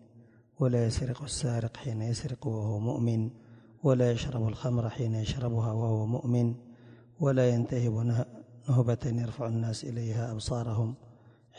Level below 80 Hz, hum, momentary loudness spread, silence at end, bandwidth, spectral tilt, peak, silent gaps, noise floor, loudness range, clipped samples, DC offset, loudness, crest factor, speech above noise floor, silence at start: -52 dBFS; none; 7 LU; 0.45 s; 10.5 kHz; -7 dB/octave; -12 dBFS; none; -58 dBFS; 2 LU; under 0.1%; under 0.1%; -31 LUFS; 18 dB; 29 dB; 0.15 s